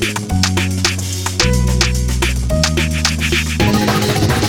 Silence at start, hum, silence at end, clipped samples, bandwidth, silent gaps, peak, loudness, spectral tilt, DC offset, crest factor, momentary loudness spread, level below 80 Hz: 0 s; none; 0 s; under 0.1%; 19.5 kHz; none; -2 dBFS; -15 LUFS; -4 dB/octave; under 0.1%; 14 dB; 3 LU; -22 dBFS